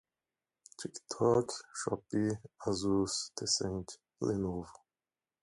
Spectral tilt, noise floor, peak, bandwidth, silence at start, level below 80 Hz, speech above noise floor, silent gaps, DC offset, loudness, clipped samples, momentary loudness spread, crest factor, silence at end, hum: -4.5 dB/octave; under -90 dBFS; -16 dBFS; 11.5 kHz; 0.8 s; -60 dBFS; over 56 dB; none; under 0.1%; -35 LUFS; under 0.1%; 15 LU; 20 dB; 0.7 s; none